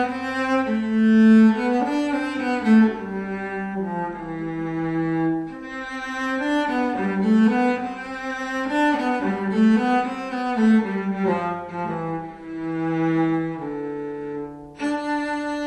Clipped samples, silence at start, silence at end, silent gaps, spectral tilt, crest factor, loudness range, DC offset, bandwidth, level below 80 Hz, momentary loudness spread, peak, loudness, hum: under 0.1%; 0 s; 0 s; none; -7 dB/octave; 16 dB; 7 LU; under 0.1%; 8.8 kHz; -56 dBFS; 13 LU; -6 dBFS; -22 LUFS; none